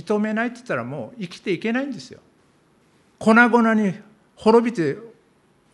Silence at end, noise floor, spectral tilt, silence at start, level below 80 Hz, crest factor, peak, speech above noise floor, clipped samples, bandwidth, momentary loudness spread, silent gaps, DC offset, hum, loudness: 0.65 s; -59 dBFS; -6.5 dB/octave; 0.05 s; -66 dBFS; 20 dB; -2 dBFS; 39 dB; under 0.1%; 11 kHz; 17 LU; none; under 0.1%; none; -20 LUFS